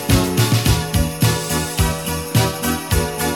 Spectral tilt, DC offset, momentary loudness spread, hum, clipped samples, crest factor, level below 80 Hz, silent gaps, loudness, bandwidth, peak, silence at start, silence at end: -4.5 dB/octave; 0.3%; 5 LU; none; under 0.1%; 16 dB; -28 dBFS; none; -18 LUFS; 17.5 kHz; 0 dBFS; 0 s; 0 s